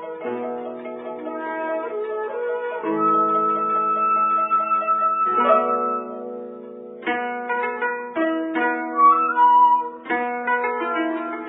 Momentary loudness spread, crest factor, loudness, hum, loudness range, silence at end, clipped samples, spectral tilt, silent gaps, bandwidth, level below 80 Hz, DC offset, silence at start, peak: 15 LU; 18 dB; -21 LUFS; none; 5 LU; 0 s; under 0.1%; -8.5 dB/octave; none; 4 kHz; -78 dBFS; under 0.1%; 0 s; -4 dBFS